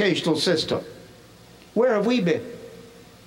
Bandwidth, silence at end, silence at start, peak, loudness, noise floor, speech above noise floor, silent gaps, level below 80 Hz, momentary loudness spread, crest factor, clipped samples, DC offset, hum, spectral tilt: 16.5 kHz; 0.25 s; 0 s; -10 dBFS; -23 LUFS; -48 dBFS; 27 dB; none; -62 dBFS; 20 LU; 16 dB; under 0.1%; under 0.1%; none; -5 dB/octave